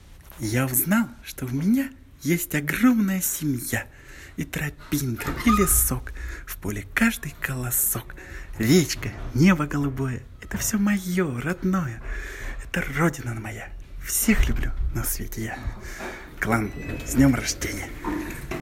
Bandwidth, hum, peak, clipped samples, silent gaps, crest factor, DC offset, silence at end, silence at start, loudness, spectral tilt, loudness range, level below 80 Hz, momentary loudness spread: 16.5 kHz; none; -6 dBFS; under 0.1%; none; 20 dB; under 0.1%; 0 s; 0.05 s; -24 LUFS; -4.5 dB/octave; 3 LU; -34 dBFS; 15 LU